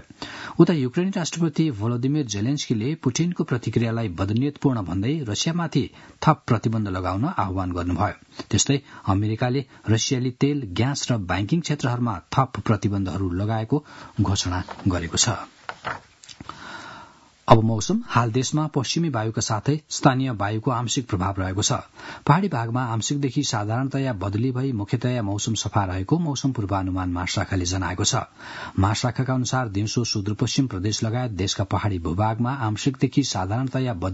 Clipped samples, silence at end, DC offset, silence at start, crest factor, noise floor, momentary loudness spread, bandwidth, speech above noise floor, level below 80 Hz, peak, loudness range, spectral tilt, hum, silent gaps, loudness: under 0.1%; 0 s; under 0.1%; 0.2 s; 24 dB; -48 dBFS; 6 LU; 8 kHz; 25 dB; -52 dBFS; 0 dBFS; 2 LU; -5 dB/octave; none; none; -24 LUFS